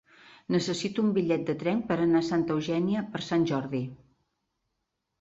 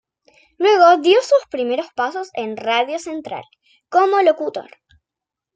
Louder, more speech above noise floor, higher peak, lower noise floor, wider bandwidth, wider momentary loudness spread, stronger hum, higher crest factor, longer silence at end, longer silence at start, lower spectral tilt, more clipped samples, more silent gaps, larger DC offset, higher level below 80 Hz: second, -28 LUFS vs -17 LUFS; second, 54 dB vs 69 dB; second, -14 dBFS vs -2 dBFS; second, -81 dBFS vs -86 dBFS; second, 8.2 kHz vs 9.2 kHz; second, 7 LU vs 16 LU; neither; about the same, 16 dB vs 16 dB; first, 1.25 s vs 0.95 s; about the same, 0.5 s vs 0.6 s; first, -6.5 dB/octave vs -3 dB/octave; neither; neither; neither; about the same, -64 dBFS vs -68 dBFS